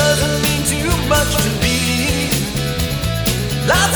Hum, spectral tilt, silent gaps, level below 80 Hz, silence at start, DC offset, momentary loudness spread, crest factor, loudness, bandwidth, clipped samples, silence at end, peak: none; -3.5 dB/octave; none; -26 dBFS; 0 s; under 0.1%; 5 LU; 16 dB; -16 LUFS; over 20 kHz; under 0.1%; 0 s; 0 dBFS